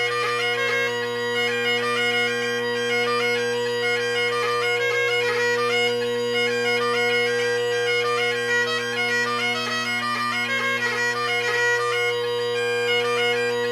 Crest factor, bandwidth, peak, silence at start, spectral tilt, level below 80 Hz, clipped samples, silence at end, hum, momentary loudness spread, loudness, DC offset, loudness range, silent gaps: 12 dB; 15.5 kHz; -12 dBFS; 0 s; -2.5 dB/octave; -66 dBFS; under 0.1%; 0 s; none; 3 LU; -21 LUFS; under 0.1%; 1 LU; none